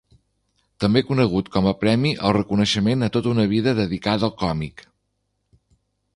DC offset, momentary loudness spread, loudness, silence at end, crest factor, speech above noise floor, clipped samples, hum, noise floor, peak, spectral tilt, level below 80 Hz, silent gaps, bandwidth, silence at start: under 0.1%; 6 LU; -21 LUFS; 1.35 s; 18 dB; 53 dB; under 0.1%; 50 Hz at -45 dBFS; -73 dBFS; -2 dBFS; -6.5 dB/octave; -46 dBFS; none; 11.5 kHz; 0.8 s